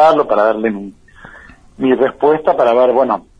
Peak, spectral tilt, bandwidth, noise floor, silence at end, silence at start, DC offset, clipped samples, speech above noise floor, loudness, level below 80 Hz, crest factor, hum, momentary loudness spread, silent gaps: 0 dBFS; -7 dB/octave; 8.8 kHz; -40 dBFS; 0.2 s; 0 s; under 0.1%; under 0.1%; 27 dB; -13 LUFS; -50 dBFS; 14 dB; none; 9 LU; none